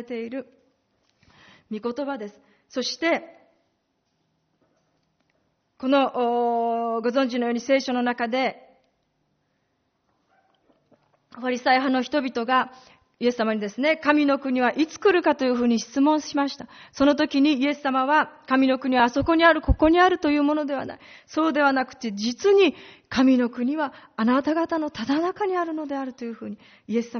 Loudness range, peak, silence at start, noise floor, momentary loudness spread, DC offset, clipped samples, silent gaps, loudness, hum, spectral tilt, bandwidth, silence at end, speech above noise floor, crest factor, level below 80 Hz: 10 LU; -4 dBFS; 0 s; -73 dBFS; 13 LU; under 0.1%; under 0.1%; none; -23 LUFS; none; -3 dB/octave; 6.6 kHz; 0 s; 50 dB; 20 dB; -44 dBFS